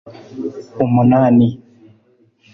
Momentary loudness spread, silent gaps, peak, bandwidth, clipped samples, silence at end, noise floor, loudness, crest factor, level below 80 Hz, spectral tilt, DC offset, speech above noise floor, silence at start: 20 LU; none; -2 dBFS; 6 kHz; under 0.1%; 1 s; -55 dBFS; -14 LUFS; 14 dB; -50 dBFS; -10.5 dB/octave; under 0.1%; 41 dB; 0.05 s